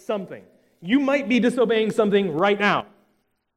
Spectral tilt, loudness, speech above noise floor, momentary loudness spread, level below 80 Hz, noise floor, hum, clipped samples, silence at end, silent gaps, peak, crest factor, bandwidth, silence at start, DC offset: -6 dB/octave; -21 LUFS; 48 dB; 10 LU; -68 dBFS; -69 dBFS; none; under 0.1%; 0.7 s; none; -4 dBFS; 18 dB; 12.5 kHz; 0.1 s; under 0.1%